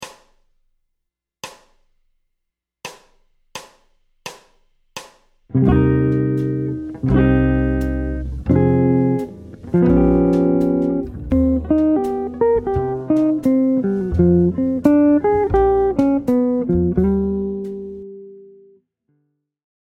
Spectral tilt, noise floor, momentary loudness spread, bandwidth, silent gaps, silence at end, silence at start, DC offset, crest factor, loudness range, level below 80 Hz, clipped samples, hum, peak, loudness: -9 dB/octave; -78 dBFS; 21 LU; 10.5 kHz; none; 1.4 s; 0 s; under 0.1%; 18 dB; 6 LU; -32 dBFS; under 0.1%; none; 0 dBFS; -17 LUFS